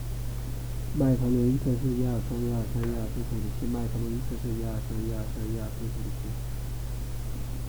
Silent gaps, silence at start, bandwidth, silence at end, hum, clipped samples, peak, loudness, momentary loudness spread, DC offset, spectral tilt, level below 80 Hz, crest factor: none; 0 s; over 20 kHz; 0 s; none; under 0.1%; -12 dBFS; -31 LUFS; 11 LU; 0.2%; -7.5 dB/octave; -36 dBFS; 16 dB